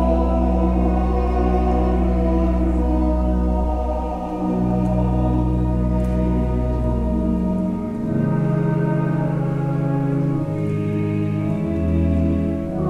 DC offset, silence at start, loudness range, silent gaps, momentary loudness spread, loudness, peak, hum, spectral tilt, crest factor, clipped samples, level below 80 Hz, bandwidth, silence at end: under 0.1%; 0 s; 2 LU; none; 4 LU; -20 LUFS; -6 dBFS; none; -10 dB/octave; 12 dB; under 0.1%; -24 dBFS; 5.4 kHz; 0 s